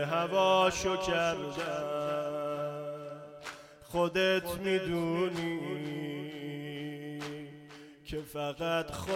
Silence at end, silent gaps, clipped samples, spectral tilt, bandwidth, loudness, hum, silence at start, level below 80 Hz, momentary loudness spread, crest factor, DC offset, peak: 0 s; none; under 0.1%; -4.5 dB/octave; 16.5 kHz; -32 LUFS; none; 0 s; -58 dBFS; 17 LU; 18 dB; under 0.1%; -14 dBFS